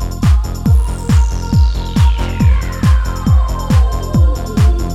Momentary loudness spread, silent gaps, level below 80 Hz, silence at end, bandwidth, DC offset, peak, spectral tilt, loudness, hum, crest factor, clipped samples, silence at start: 1 LU; none; -14 dBFS; 0 s; 12.5 kHz; under 0.1%; -2 dBFS; -7 dB/octave; -14 LUFS; none; 10 dB; under 0.1%; 0 s